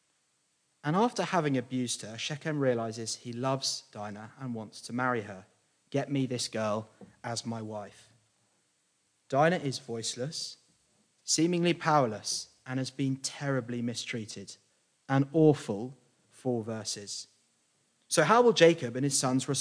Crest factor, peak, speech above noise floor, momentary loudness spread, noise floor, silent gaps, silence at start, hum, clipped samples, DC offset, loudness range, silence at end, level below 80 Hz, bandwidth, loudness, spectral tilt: 24 dB; -6 dBFS; 44 dB; 16 LU; -74 dBFS; none; 0.85 s; none; under 0.1%; under 0.1%; 7 LU; 0 s; -80 dBFS; 10.5 kHz; -30 LUFS; -4.5 dB/octave